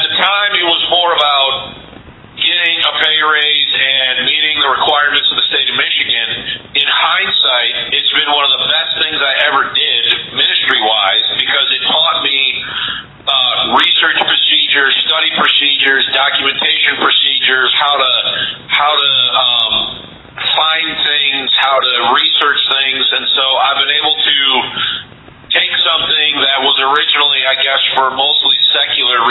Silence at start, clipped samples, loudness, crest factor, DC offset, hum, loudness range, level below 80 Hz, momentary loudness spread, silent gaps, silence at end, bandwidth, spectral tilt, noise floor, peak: 0 s; under 0.1%; -10 LUFS; 12 dB; under 0.1%; none; 2 LU; -52 dBFS; 4 LU; none; 0 s; 8 kHz; -3.5 dB/octave; -35 dBFS; 0 dBFS